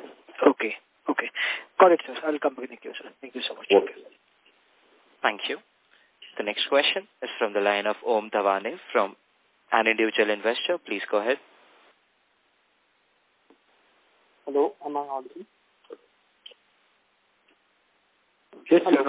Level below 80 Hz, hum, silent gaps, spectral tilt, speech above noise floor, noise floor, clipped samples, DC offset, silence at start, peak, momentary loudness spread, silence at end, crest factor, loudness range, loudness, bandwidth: -84 dBFS; none; none; -7 dB/octave; 43 dB; -68 dBFS; under 0.1%; under 0.1%; 0 s; -2 dBFS; 16 LU; 0 s; 26 dB; 9 LU; -25 LUFS; 4 kHz